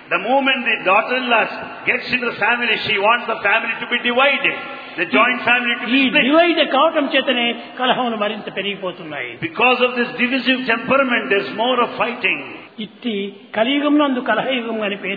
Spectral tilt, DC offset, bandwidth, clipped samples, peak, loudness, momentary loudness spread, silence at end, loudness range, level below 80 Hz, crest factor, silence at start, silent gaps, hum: -6.5 dB/octave; under 0.1%; 5 kHz; under 0.1%; 0 dBFS; -17 LUFS; 10 LU; 0 s; 4 LU; -64 dBFS; 18 dB; 0 s; none; none